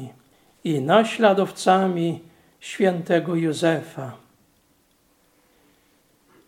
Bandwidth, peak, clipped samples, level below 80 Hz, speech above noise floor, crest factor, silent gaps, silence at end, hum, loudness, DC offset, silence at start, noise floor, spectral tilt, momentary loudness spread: 16 kHz; -4 dBFS; under 0.1%; -72 dBFS; 42 dB; 20 dB; none; 2.3 s; none; -21 LUFS; under 0.1%; 0 s; -63 dBFS; -6 dB/octave; 17 LU